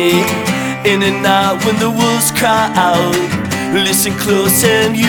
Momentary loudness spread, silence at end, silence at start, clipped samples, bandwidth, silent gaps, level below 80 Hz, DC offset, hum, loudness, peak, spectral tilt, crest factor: 5 LU; 0 s; 0 s; under 0.1%; 19.5 kHz; none; -46 dBFS; under 0.1%; none; -12 LUFS; 0 dBFS; -3.5 dB/octave; 12 dB